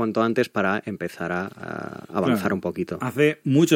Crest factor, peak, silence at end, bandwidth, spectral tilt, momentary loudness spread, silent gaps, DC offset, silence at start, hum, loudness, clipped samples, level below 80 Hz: 18 dB; -6 dBFS; 0 s; 17 kHz; -6 dB/octave; 11 LU; none; under 0.1%; 0 s; none; -24 LUFS; under 0.1%; -62 dBFS